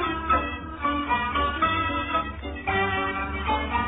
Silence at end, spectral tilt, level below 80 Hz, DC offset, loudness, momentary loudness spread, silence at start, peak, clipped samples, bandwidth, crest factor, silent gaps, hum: 0 s; -9.5 dB/octave; -38 dBFS; under 0.1%; -26 LUFS; 5 LU; 0 s; -10 dBFS; under 0.1%; 4 kHz; 16 dB; none; none